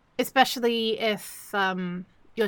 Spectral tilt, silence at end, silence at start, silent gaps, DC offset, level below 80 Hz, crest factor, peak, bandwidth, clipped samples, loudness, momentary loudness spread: -3.5 dB/octave; 0 s; 0.2 s; none; under 0.1%; -68 dBFS; 20 dB; -6 dBFS; 17.5 kHz; under 0.1%; -26 LUFS; 12 LU